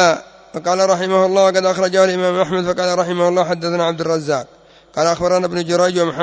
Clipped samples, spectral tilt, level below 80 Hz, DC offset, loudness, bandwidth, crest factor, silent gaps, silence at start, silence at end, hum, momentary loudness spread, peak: under 0.1%; -4.5 dB/octave; -54 dBFS; under 0.1%; -16 LUFS; 8 kHz; 14 dB; none; 0 s; 0 s; none; 7 LU; -2 dBFS